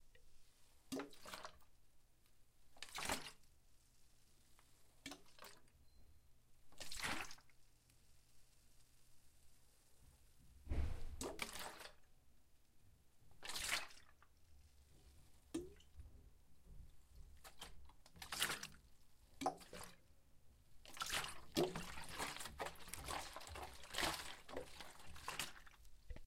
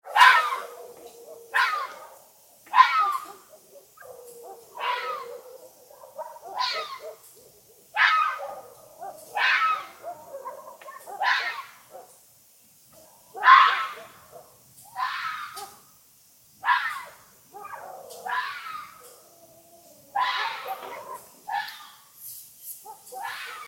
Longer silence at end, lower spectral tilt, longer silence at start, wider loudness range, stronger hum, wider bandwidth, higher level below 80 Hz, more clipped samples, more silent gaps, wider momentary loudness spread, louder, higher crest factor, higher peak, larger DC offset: about the same, 0 s vs 0 s; first, -2.5 dB/octave vs 1 dB/octave; about the same, 0 s vs 0.05 s; about the same, 12 LU vs 10 LU; neither; about the same, 16 kHz vs 17 kHz; first, -60 dBFS vs -80 dBFS; neither; neither; about the same, 23 LU vs 25 LU; second, -48 LUFS vs -24 LUFS; about the same, 28 dB vs 26 dB; second, -22 dBFS vs -2 dBFS; neither